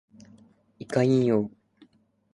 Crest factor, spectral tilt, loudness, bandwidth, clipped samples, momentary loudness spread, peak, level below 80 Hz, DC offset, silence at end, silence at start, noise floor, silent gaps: 18 dB; -8 dB/octave; -25 LUFS; 11.5 kHz; under 0.1%; 16 LU; -10 dBFS; -66 dBFS; under 0.1%; 0.85 s; 0.8 s; -63 dBFS; none